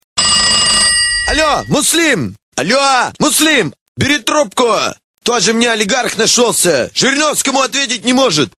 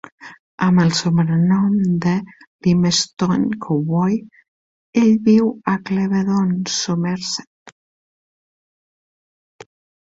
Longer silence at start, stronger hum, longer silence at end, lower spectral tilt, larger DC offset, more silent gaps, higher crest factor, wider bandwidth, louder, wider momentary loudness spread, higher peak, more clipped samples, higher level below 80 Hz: about the same, 0.15 s vs 0.2 s; neither; second, 0.1 s vs 2.35 s; second, -2 dB/octave vs -5.5 dB/octave; first, 0.1% vs under 0.1%; second, 2.42-2.52 s, 3.81-3.95 s, 5.04-5.14 s vs 0.40-0.58 s, 2.47-2.59 s, 4.48-4.93 s, 7.47-7.66 s; about the same, 12 dB vs 16 dB; first, 16 kHz vs 7.8 kHz; first, -11 LUFS vs -18 LUFS; about the same, 7 LU vs 8 LU; about the same, 0 dBFS vs -2 dBFS; neither; first, -38 dBFS vs -56 dBFS